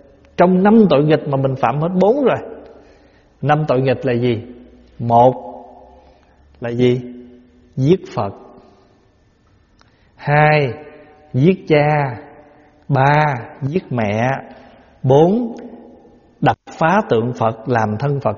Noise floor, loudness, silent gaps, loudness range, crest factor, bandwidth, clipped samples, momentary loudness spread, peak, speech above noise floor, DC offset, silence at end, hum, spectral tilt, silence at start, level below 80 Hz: -54 dBFS; -16 LUFS; none; 5 LU; 18 dB; 7.2 kHz; under 0.1%; 15 LU; 0 dBFS; 40 dB; under 0.1%; 0 s; none; -6.5 dB/octave; 0.4 s; -50 dBFS